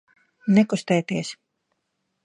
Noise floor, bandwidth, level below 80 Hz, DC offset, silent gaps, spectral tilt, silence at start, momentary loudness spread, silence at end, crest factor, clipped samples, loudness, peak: -76 dBFS; 10.5 kHz; -68 dBFS; under 0.1%; none; -6 dB/octave; 0.45 s; 13 LU; 0.9 s; 18 dB; under 0.1%; -22 LUFS; -6 dBFS